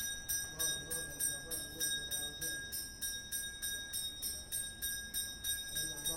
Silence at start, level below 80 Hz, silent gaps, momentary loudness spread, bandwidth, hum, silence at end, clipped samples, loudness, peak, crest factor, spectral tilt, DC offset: 0 s; -58 dBFS; none; 4 LU; 17 kHz; none; 0 s; under 0.1%; -38 LUFS; -22 dBFS; 18 dB; 0 dB/octave; under 0.1%